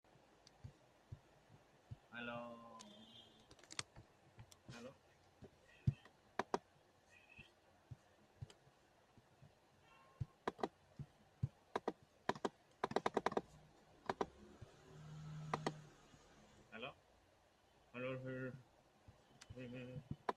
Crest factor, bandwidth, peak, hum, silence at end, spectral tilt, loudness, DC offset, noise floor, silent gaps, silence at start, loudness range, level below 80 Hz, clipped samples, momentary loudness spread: 30 dB; 13 kHz; -20 dBFS; none; 0 s; -5.5 dB/octave; -49 LUFS; under 0.1%; -73 dBFS; none; 0.15 s; 10 LU; -72 dBFS; under 0.1%; 23 LU